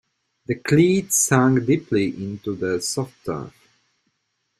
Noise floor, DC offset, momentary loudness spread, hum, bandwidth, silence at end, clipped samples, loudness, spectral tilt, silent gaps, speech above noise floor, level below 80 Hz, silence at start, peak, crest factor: -73 dBFS; under 0.1%; 14 LU; none; 15 kHz; 1.1 s; under 0.1%; -21 LUFS; -5 dB/octave; none; 53 dB; -58 dBFS; 0.5 s; -2 dBFS; 20 dB